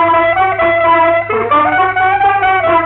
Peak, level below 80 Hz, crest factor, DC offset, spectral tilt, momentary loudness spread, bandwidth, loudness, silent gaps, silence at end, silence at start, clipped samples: -2 dBFS; -42 dBFS; 10 dB; under 0.1%; -9.5 dB/octave; 2 LU; 4.2 kHz; -11 LUFS; none; 0 s; 0 s; under 0.1%